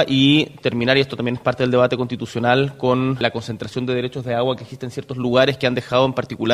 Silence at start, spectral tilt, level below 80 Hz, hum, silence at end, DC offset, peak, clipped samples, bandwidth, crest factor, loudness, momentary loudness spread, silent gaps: 0 s; -6.5 dB/octave; -52 dBFS; none; 0 s; under 0.1%; 0 dBFS; under 0.1%; 12.5 kHz; 18 dB; -19 LUFS; 9 LU; none